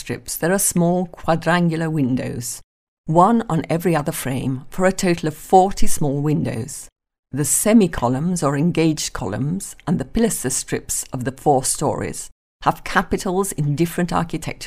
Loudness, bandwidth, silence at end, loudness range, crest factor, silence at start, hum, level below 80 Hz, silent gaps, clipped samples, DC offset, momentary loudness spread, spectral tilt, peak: -20 LUFS; 16 kHz; 0 s; 3 LU; 18 dB; 0 s; none; -36 dBFS; 2.64-3.04 s, 6.92-6.96 s, 7.19-7.23 s, 12.32-12.60 s; under 0.1%; under 0.1%; 11 LU; -5 dB/octave; -2 dBFS